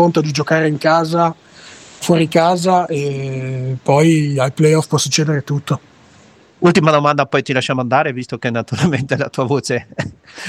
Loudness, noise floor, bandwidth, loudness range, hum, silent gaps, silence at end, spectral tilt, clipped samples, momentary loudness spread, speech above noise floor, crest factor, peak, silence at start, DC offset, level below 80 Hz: -16 LUFS; -47 dBFS; 15.5 kHz; 2 LU; none; none; 0 s; -5.5 dB/octave; under 0.1%; 10 LU; 31 dB; 16 dB; 0 dBFS; 0 s; under 0.1%; -54 dBFS